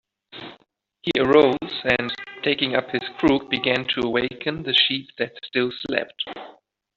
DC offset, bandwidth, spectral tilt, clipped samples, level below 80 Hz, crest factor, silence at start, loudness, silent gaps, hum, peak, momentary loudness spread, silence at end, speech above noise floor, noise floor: under 0.1%; 7.4 kHz; -2 dB/octave; under 0.1%; -54 dBFS; 20 dB; 0.35 s; -22 LUFS; none; none; -4 dBFS; 14 LU; 0.45 s; 38 dB; -60 dBFS